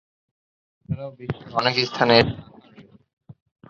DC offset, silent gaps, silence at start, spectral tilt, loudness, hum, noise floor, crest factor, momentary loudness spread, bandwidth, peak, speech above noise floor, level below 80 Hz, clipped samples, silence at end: under 0.1%; 3.13-3.17 s; 0.9 s; -5.5 dB/octave; -21 LUFS; none; -50 dBFS; 24 dB; 17 LU; 7.4 kHz; -2 dBFS; 29 dB; -50 dBFS; under 0.1%; 0.4 s